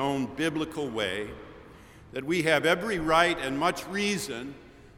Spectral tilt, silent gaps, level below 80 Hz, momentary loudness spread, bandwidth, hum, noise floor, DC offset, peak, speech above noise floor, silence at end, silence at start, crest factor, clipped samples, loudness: -4 dB/octave; none; -54 dBFS; 16 LU; 18.5 kHz; none; -50 dBFS; under 0.1%; -8 dBFS; 22 dB; 0.05 s; 0 s; 22 dB; under 0.1%; -27 LUFS